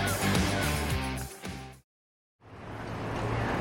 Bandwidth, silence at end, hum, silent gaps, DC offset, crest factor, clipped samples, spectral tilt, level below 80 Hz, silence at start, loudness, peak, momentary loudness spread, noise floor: 17 kHz; 0 s; none; 1.84-2.39 s; under 0.1%; 18 dB; under 0.1%; -4.5 dB/octave; -42 dBFS; 0 s; -31 LUFS; -14 dBFS; 18 LU; under -90 dBFS